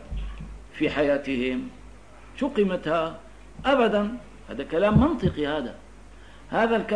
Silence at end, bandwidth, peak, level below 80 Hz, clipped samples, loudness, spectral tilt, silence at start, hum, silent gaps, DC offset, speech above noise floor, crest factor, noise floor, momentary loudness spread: 0 s; 10.5 kHz; -6 dBFS; -42 dBFS; under 0.1%; -25 LUFS; -7.5 dB/octave; 0 s; none; none; 0.3%; 24 dB; 18 dB; -47 dBFS; 18 LU